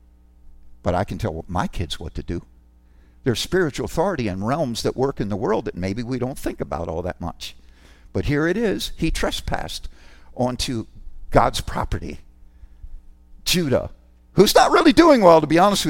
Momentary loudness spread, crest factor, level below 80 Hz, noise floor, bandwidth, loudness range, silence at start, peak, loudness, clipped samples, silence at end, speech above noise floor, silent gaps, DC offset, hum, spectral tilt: 18 LU; 20 dB; -36 dBFS; -51 dBFS; 16.5 kHz; 8 LU; 0.45 s; 0 dBFS; -21 LUFS; under 0.1%; 0 s; 31 dB; none; under 0.1%; none; -5 dB/octave